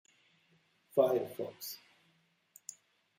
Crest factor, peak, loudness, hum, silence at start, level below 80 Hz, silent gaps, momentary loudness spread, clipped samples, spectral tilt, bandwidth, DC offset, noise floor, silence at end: 24 dB; -14 dBFS; -34 LUFS; none; 0.95 s; -86 dBFS; none; 20 LU; under 0.1%; -4.5 dB/octave; 16 kHz; under 0.1%; -73 dBFS; 1.4 s